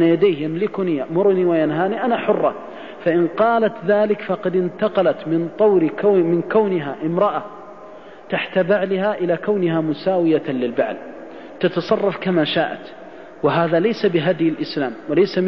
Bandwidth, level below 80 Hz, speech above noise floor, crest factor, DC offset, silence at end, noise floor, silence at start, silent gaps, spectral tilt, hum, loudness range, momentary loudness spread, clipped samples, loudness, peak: 6.2 kHz; -62 dBFS; 21 dB; 14 dB; 0.4%; 0 s; -39 dBFS; 0 s; none; -8.5 dB/octave; none; 3 LU; 12 LU; under 0.1%; -19 LUFS; -6 dBFS